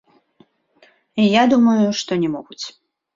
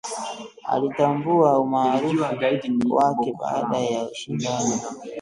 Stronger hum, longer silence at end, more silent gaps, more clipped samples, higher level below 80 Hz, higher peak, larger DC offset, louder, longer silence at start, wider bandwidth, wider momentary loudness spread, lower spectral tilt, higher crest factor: neither; first, 0.45 s vs 0 s; neither; neither; about the same, -62 dBFS vs -64 dBFS; about the same, -2 dBFS vs -4 dBFS; neither; first, -17 LUFS vs -22 LUFS; first, 1.15 s vs 0.05 s; second, 7.6 kHz vs 11.5 kHz; first, 18 LU vs 11 LU; about the same, -5.5 dB/octave vs -5 dB/octave; about the same, 18 dB vs 18 dB